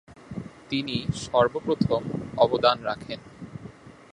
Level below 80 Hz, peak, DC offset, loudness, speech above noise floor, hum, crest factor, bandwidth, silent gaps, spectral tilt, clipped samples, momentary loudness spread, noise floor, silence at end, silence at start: -52 dBFS; -4 dBFS; under 0.1%; -25 LUFS; 21 dB; none; 22 dB; 11 kHz; none; -6 dB/octave; under 0.1%; 19 LU; -45 dBFS; 0.2 s; 0.1 s